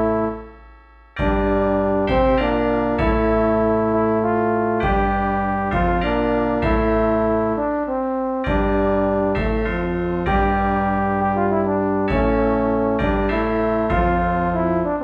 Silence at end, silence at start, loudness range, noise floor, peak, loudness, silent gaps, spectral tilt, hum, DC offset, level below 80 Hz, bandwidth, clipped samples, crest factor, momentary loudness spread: 0 s; 0 s; 2 LU; -46 dBFS; -6 dBFS; -19 LUFS; none; -9.5 dB/octave; none; under 0.1%; -30 dBFS; 5.2 kHz; under 0.1%; 14 dB; 4 LU